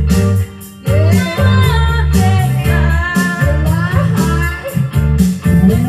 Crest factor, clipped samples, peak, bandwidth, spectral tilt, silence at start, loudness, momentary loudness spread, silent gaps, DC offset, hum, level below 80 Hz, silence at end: 12 dB; under 0.1%; 0 dBFS; 15 kHz; -6.5 dB/octave; 0 s; -13 LUFS; 5 LU; none; under 0.1%; none; -20 dBFS; 0 s